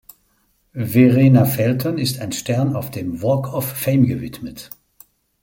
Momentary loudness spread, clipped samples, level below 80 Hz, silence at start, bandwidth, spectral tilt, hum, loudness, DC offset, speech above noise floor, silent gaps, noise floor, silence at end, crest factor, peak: 19 LU; under 0.1%; -52 dBFS; 0.75 s; 17 kHz; -6.5 dB/octave; none; -18 LUFS; under 0.1%; 45 dB; none; -63 dBFS; 0.75 s; 16 dB; -2 dBFS